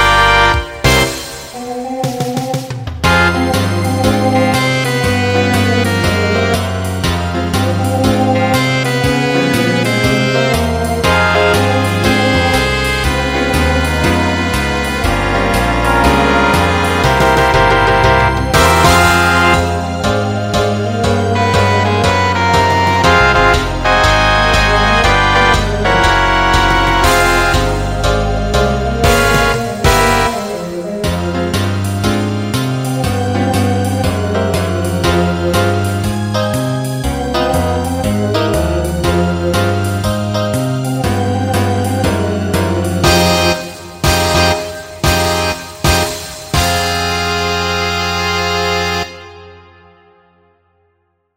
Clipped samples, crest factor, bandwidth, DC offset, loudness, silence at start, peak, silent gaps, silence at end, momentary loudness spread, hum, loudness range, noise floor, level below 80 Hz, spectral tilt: under 0.1%; 12 dB; 16.5 kHz; under 0.1%; -13 LUFS; 0 s; 0 dBFS; none; 1.8 s; 7 LU; none; 5 LU; -62 dBFS; -24 dBFS; -4.5 dB/octave